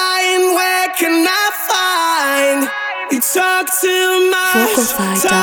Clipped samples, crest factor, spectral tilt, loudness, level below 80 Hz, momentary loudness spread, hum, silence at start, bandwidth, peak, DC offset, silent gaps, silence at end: under 0.1%; 14 dB; -2 dB/octave; -13 LUFS; -56 dBFS; 2 LU; none; 0 s; over 20 kHz; 0 dBFS; under 0.1%; none; 0 s